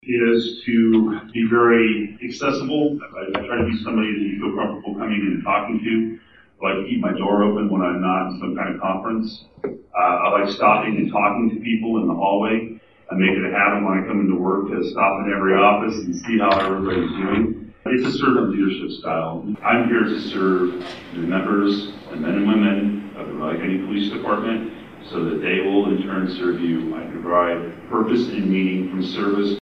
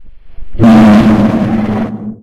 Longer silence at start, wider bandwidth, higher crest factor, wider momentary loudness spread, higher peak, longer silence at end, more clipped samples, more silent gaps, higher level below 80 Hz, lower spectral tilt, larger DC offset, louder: about the same, 0.05 s vs 0 s; second, 7.6 kHz vs 8.4 kHz; first, 18 dB vs 8 dB; about the same, 10 LU vs 12 LU; about the same, -2 dBFS vs 0 dBFS; about the same, 0 s vs 0.1 s; neither; neither; second, -54 dBFS vs -28 dBFS; about the same, -7 dB/octave vs -8 dB/octave; first, 0.1% vs under 0.1%; second, -20 LUFS vs -8 LUFS